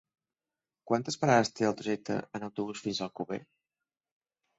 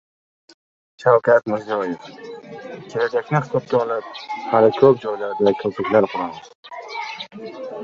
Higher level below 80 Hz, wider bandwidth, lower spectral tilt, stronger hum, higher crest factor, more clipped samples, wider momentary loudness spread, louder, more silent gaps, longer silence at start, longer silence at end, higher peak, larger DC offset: second, -70 dBFS vs -64 dBFS; first, 8.2 kHz vs 7.4 kHz; second, -5 dB/octave vs -7 dB/octave; neither; about the same, 24 dB vs 20 dB; neither; second, 13 LU vs 20 LU; second, -32 LUFS vs -20 LUFS; second, none vs 6.55-6.63 s; second, 0.85 s vs 1 s; first, 1.15 s vs 0 s; second, -10 dBFS vs -2 dBFS; neither